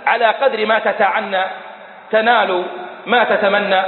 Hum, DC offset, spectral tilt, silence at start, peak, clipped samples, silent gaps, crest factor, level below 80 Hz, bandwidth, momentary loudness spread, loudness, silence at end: none; under 0.1%; -9 dB/octave; 0 s; 0 dBFS; under 0.1%; none; 16 dB; -70 dBFS; 4.4 kHz; 12 LU; -15 LUFS; 0 s